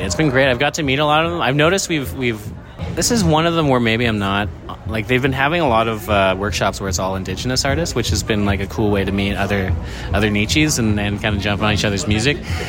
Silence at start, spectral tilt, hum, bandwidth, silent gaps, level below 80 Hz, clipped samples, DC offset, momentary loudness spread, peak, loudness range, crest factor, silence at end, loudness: 0 s; -4.5 dB/octave; none; 16.5 kHz; none; -34 dBFS; under 0.1%; under 0.1%; 7 LU; 0 dBFS; 2 LU; 18 dB; 0 s; -17 LUFS